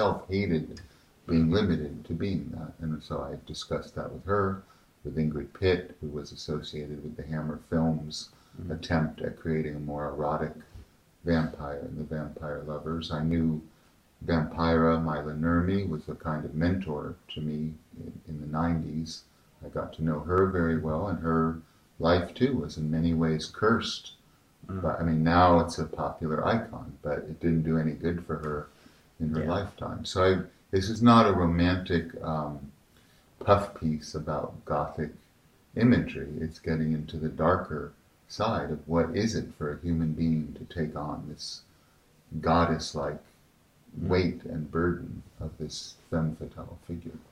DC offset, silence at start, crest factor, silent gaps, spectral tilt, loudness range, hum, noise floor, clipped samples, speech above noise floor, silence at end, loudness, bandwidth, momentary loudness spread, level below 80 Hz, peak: under 0.1%; 0 s; 22 dB; none; -7 dB/octave; 7 LU; none; -62 dBFS; under 0.1%; 34 dB; 0.1 s; -29 LUFS; 11 kHz; 14 LU; -50 dBFS; -6 dBFS